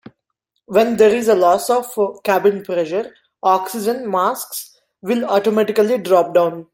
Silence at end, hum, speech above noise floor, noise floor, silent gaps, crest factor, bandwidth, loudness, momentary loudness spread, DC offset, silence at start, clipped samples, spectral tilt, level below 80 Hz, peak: 0.1 s; none; 57 dB; -74 dBFS; none; 16 dB; 16.5 kHz; -17 LUFS; 9 LU; under 0.1%; 0.7 s; under 0.1%; -4.5 dB/octave; -62 dBFS; -2 dBFS